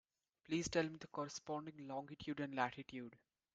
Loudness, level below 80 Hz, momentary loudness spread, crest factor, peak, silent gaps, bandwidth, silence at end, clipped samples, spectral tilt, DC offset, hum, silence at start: -45 LUFS; -74 dBFS; 11 LU; 22 dB; -24 dBFS; none; 9.2 kHz; 0.4 s; under 0.1%; -4.5 dB/octave; under 0.1%; none; 0.5 s